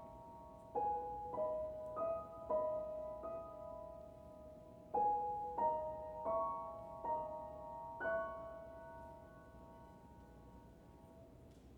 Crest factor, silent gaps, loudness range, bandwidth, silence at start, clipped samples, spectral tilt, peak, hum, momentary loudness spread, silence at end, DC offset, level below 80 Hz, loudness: 18 dB; none; 7 LU; 19 kHz; 0 s; under 0.1%; -7.5 dB/octave; -26 dBFS; none; 21 LU; 0 s; under 0.1%; -66 dBFS; -43 LUFS